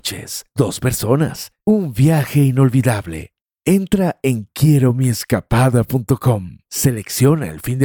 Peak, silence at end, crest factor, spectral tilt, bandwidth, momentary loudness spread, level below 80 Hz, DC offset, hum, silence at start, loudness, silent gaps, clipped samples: -2 dBFS; 0 s; 14 dB; -6 dB/octave; 19 kHz; 9 LU; -40 dBFS; under 0.1%; none; 0.05 s; -17 LUFS; 3.41-3.45 s; under 0.1%